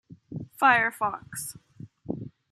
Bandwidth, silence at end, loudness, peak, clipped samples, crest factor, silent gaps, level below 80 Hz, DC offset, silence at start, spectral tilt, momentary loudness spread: 15.5 kHz; 0.25 s; -25 LUFS; -6 dBFS; under 0.1%; 22 dB; none; -64 dBFS; under 0.1%; 0.1 s; -3.5 dB/octave; 21 LU